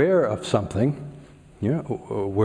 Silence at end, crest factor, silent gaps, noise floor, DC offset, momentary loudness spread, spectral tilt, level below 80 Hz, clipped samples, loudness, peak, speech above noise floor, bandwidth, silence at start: 0 s; 18 dB; none; -46 dBFS; under 0.1%; 9 LU; -7.5 dB/octave; -52 dBFS; under 0.1%; -25 LUFS; -6 dBFS; 24 dB; 10.5 kHz; 0 s